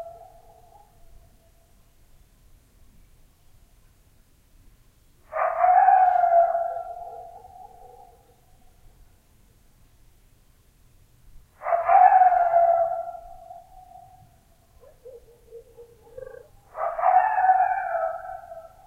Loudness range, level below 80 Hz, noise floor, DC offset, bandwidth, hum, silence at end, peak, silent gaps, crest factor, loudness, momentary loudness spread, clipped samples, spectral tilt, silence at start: 14 LU; -56 dBFS; -58 dBFS; under 0.1%; 3.1 kHz; none; 0.25 s; -4 dBFS; none; 22 dB; -20 LUFS; 27 LU; under 0.1%; -4.5 dB/octave; 0 s